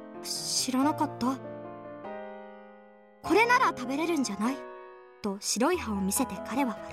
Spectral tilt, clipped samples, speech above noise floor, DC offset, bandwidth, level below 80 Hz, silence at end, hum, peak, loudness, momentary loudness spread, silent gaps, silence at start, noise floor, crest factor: -3 dB/octave; under 0.1%; 26 dB; under 0.1%; 16.5 kHz; -64 dBFS; 0 s; none; -12 dBFS; -28 LUFS; 18 LU; none; 0 s; -54 dBFS; 18 dB